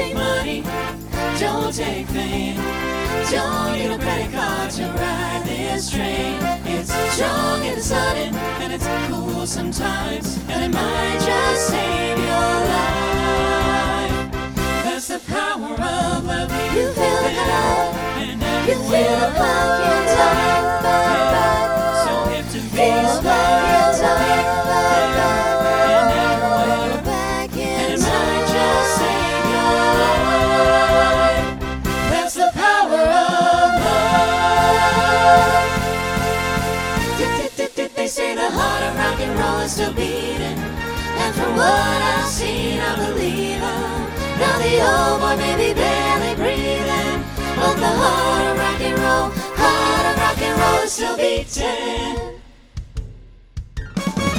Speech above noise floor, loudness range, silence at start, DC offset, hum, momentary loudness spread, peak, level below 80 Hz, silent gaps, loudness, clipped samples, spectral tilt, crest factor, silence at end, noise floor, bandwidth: 21 dB; 6 LU; 0 s; under 0.1%; none; 9 LU; 0 dBFS; -32 dBFS; none; -18 LUFS; under 0.1%; -4 dB/octave; 18 dB; 0 s; -40 dBFS; over 20 kHz